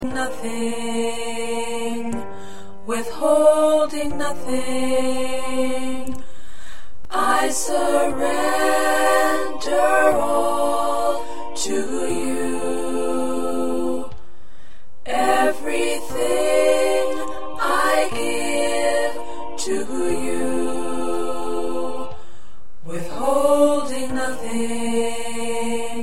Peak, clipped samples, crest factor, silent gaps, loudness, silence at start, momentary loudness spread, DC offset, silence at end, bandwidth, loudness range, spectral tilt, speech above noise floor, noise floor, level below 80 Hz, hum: -2 dBFS; under 0.1%; 18 dB; none; -21 LUFS; 0 s; 11 LU; 8%; 0 s; 16.5 kHz; 6 LU; -3.5 dB/octave; 28 dB; -51 dBFS; -48 dBFS; none